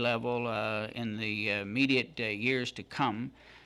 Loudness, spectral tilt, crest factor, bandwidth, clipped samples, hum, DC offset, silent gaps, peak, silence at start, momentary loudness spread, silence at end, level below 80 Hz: -32 LUFS; -5.5 dB/octave; 18 dB; 12.5 kHz; under 0.1%; none; under 0.1%; none; -14 dBFS; 0 s; 8 LU; 0.05 s; -66 dBFS